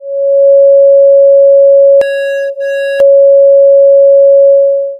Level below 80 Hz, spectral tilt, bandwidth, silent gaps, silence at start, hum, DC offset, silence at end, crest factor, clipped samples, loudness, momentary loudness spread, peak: -62 dBFS; -2.5 dB/octave; 5.2 kHz; none; 0 s; none; under 0.1%; 0 s; 4 dB; under 0.1%; -5 LUFS; 9 LU; 0 dBFS